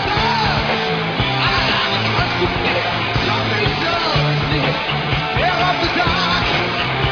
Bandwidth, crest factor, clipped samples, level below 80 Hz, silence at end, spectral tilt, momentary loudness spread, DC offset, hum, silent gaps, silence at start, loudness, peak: 5.4 kHz; 14 dB; under 0.1%; -34 dBFS; 0 s; -5.5 dB/octave; 3 LU; under 0.1%; none; none; 0 s; -17 LUFS; -2 dBFS